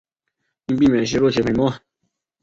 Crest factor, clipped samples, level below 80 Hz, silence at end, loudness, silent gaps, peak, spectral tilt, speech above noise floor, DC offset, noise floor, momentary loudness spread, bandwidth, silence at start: 16 dB; under 0.1%; -48 dBFS; 0.65 s; -19 LUFS; none; -6 dBFS; -6 dB/octave; 58 dB; under 0.1%; -76 dBFS; 15 LU; 7.8 kHz; 0.7 s